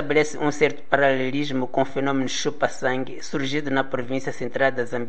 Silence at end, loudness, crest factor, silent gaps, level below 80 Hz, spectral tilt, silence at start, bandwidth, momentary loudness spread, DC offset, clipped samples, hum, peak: 0 s; -24 LUFS; 22 dB; none; -62 dBFS; -4.5 dB/octave; 0 s; 8.8 kHz; 7 LU; 4%; under 0.1%; none; -2 dBFS